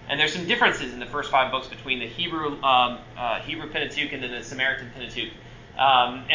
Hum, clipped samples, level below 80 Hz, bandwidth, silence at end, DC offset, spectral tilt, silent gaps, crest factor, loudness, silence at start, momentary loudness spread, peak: none; under 0.1%; -52 dBFS; 7.6 kHz; 0 s; under 0.1%; -3.5 dB/octave; none; 18 dB; -24 LUFS; 0 s; 11 LU; -6 dBFS